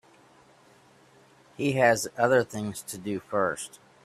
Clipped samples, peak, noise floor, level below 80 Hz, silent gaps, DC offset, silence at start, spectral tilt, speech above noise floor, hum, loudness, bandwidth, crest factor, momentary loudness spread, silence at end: under 0.1%; -6 dBFS; -58 dBFS; -66 dBFS; none; under 0.1%; 1.6 s; -4.5 dB/octave; 31 dB; none; -27 LUFS; 15.5 kHz; 22 dB; 13 LU; 0.35 s